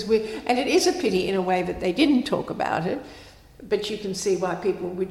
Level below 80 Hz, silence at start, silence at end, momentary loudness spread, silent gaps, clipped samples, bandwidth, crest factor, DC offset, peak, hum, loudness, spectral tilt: -52 dBFS; 0 s; 0 s; 8 LU; none; under 0.1%; 15 kHz; 16 dB; under 0.1%; -8 dBFS; none; -24 LUFS; -4.5 dB/octave